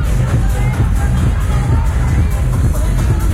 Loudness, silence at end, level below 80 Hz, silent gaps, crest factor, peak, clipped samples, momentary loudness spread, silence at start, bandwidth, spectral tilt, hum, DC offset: -15 LUFS; 0 s; -16 dBFS; none; 10 dB; -4 dBFS; under 0.1%; 1 LU; 0 s; 15.5 kHz; -7 dB/octave; none; under 0.1%